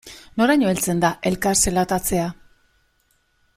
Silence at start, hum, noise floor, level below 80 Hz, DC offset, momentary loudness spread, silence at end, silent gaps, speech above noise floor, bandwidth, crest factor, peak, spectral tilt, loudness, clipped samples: 0.05 s; none; -65 dBFS; -42 dBFS; under 0.1%; 7 LU; 1.25 s; none; 45 dB; 16.5 kHz; 18 dB; -4 dBFS; -4 dB/octave; -20 LUFS; under 0.1%